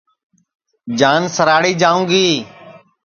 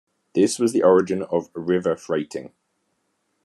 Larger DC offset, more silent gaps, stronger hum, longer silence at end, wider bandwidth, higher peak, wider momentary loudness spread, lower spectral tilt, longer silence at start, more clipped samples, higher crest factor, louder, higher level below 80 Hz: neither; neither; neither; second, 0.25 s vs 0.95 s; second, 7.4 kHz vs 12.5 kHz; first, 0 dBFS vs -4 dBFS; first, 13 LU vs 10 LU; second, -4 dB/octave vs -5.5 dB/octave; first, 0.85 s vs 0.35 s; neither; about the same, 16 dB vs 18 dB; first, -14 LUFS vs -21 LUFS; first, -60 dBFS vs -72 dBFS